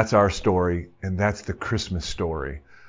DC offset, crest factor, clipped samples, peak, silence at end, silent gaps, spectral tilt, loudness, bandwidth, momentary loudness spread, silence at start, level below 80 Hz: under 0.1%; 20 dB; under 0.1%; -4 dBFS; 0 s; none; -6 dB/octave; -25 LUFS; 7.6 kHz; 11 LU; 0 s; -38 dBFS